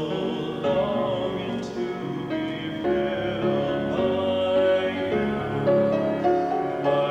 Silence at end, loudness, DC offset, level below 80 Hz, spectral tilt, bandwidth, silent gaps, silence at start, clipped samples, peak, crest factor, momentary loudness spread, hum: 0 s; -25 LUFS; under 0.1%; -52 dBFS; -7 dB/octave; 8.4 kHz; none; 0 s; under 0.1%; -12 dBFS; 14 dB; 8 LU; none